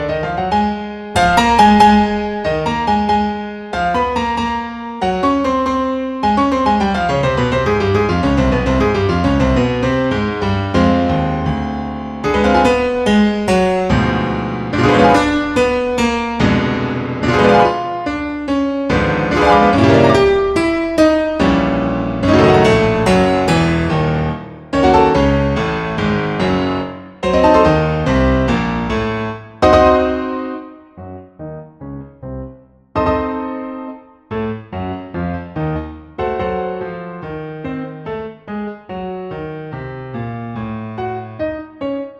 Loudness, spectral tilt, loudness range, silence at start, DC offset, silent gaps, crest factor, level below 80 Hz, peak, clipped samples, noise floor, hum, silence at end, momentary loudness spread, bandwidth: -15 LUFS; -6.5 dB/octave; 11 LU; 0 s; under 0.1%; none; 16 dB; -32 dBFS; 0 dBFS; under 0.1%; -39 dBFS; none; 0 s; 16 LU; 12 kHz